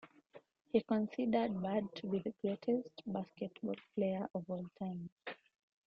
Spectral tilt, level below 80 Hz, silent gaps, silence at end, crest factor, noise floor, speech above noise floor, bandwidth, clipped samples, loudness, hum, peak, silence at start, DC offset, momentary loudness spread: -9 dB/octave; -76 dBFS; 5.12-5.17 s; 0.5 s; 20 dB; -63 dBFS; 24 dB; 6.4 kHz; under 0.1%; -39 LUFS; none; -18 dBFS; 0.05 s; under 0.1%; 11 LU